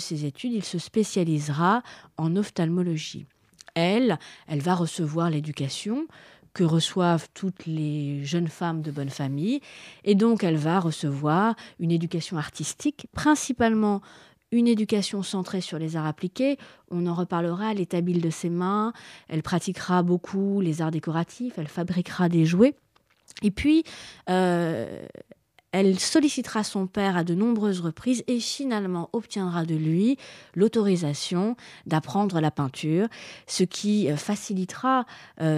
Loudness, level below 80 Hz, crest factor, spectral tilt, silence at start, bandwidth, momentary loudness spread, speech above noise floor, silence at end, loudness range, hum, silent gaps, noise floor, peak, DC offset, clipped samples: -26 LUFS; -58 dBFS; 18 dB; -6 dB/octave; 0 s; 13.5 kHz; 10 LU; 32 dB; 0 s; 2 LU; none; none; -57 dBFS; -6 dBFS; under 0.1%; under 0.1%